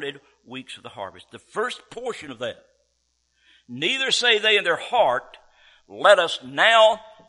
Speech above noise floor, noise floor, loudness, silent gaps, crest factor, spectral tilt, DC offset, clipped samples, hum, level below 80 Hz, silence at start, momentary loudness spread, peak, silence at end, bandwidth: 49 dB; -71 dBFS; -19 LUFS; none; 22 dB; -1.5 dB/octave; under 0.1%; under 0.1%; none; -68 dBFS; 0 s; 20 LU; -2 dBFS; 0.3 s; 11.5 kHz